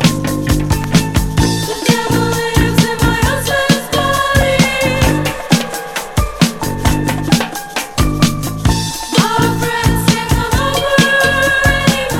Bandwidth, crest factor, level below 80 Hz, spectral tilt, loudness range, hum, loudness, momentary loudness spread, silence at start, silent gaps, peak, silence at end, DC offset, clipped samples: 18 kHz; 14 dB; -24 dBFS; -4.5 dB/octave; 3 LU; none; -14 LUFS; 6 LU; 0 s; none; 0 dBFS; 0 s; under 0.1%; under 0.1%